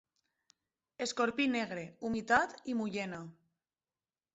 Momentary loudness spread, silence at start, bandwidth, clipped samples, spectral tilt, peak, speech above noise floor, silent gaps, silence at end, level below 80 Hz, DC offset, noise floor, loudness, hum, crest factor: 11 LU; 1 s; 8 kHz; under 0.1%; -3 dB/octave; -14 dBFS; over 56 dB; none; 1.05 s; -70 dBFS; under 0.1%; under -90 dBFS; -34 LUFS; none; 22 dB